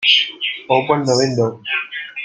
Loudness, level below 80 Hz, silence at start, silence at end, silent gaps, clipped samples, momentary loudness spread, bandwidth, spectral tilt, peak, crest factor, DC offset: -17 LUFS; -62 dBFS; 0 s; 0 s; none; under 0.1%; 8 LU; 9.6 kHz; -3.5 dB/octave; -2 dBFS; 16 dB; under 0.1%